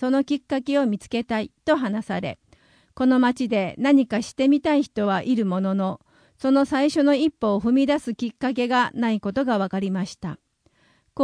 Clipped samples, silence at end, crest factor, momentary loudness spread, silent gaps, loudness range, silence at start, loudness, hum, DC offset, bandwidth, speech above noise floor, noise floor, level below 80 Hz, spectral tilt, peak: under 0.1%; 0 s; 16 dB; 10 LU; none; 3 LU; 0 s; -22 LUFS; none; under 0.1%; 10.5 kHz; 41 dB; -63 dBFS; -58 dBFS; -6 dB/octave; -6 dBFS